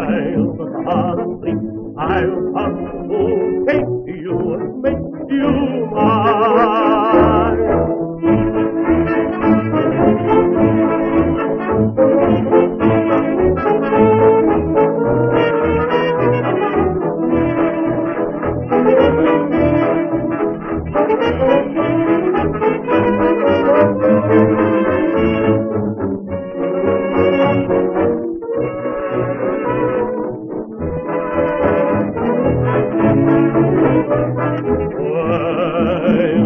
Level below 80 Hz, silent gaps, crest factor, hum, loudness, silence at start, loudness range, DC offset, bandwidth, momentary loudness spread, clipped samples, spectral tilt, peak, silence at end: -36 dBFS; none; 14 dB; none; -15 LUFS; 0 s; 5 LU; under 0.1%; 5.4 kHz; 8 LU; under 0.1%; -7 dB/octave; 0 dBFS; 0 s